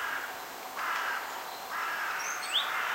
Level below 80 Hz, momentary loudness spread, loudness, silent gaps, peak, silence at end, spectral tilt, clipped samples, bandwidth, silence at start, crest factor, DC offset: -76 dBFS; 10 LU; -33 LUFS; none; -18 dBFS; 0 s; 1 dB/octave; under 0.1%; 16 kHz; 0 s; 18 dB; under 0.1%